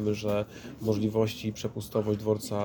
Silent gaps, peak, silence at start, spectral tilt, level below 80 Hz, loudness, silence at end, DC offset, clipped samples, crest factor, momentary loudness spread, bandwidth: none; -14 dBFS; 0 s; -6.5 dB/octave; -56 dBFS; -30 LUFS; 0 s; under 0.1%; under 0.1%; 16 dB; 7 LU; 19 kHz